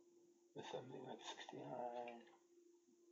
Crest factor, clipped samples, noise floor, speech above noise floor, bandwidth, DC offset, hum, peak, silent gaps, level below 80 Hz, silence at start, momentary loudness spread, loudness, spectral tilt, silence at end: 18 dB; under 0.1%; -73 dBFS; 20 dB; 7.6 kHz; under 0.1%; none; -36 dBFS; none; under -90 dBFS; 0 s; 11 LU; -53 LUFS; -3 dB/octave; 0 s